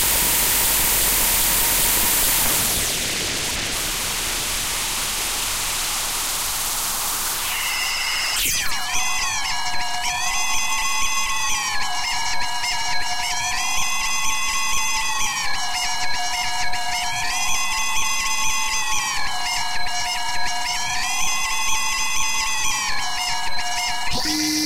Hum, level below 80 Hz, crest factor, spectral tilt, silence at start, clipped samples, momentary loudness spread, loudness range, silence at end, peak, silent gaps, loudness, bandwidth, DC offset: none; -38 dBFS; 16 dB; 0 dB/octave; 0 s; under 0.1%; 7 LU; 4 LU; 0 s; -6 dBFS; none; -20 LUFS; 16 kHz; under 0.1%